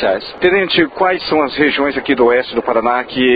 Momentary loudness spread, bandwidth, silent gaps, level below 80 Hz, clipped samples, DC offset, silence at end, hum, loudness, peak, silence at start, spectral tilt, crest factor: 4 LU; 5 kHz; none; -46 dBFS; under 0.1%; under 0.1%; 0 s; none; -14 LUFS; 0 dBFS; 0 s; -7.5 dB/octave; 14 dB